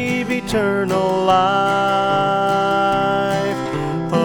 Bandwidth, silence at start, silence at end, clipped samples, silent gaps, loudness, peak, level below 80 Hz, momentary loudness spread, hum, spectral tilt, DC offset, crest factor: 19 kHz; 0 s; 0 s; under 0.1%; none; -18 LUFS; -2 dBFS; -44 dBFS; 6 LU; none; -5.5 dB/octave; under 0.1%; 14 dB